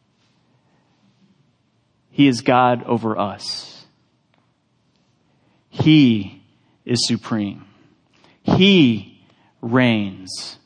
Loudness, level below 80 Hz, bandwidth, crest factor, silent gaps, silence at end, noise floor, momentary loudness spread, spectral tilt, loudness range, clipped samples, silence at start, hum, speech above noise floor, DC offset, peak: -18 LUFS; -60 dBFS; 10 kHz; 18 dB; none; 0.1 s; -64 dBFS; 18 LU; -5.5 dB/octave; 3 LU; under 0.1%; 2.2 s; none; 47 dB; under 0.1%; -2 dBFS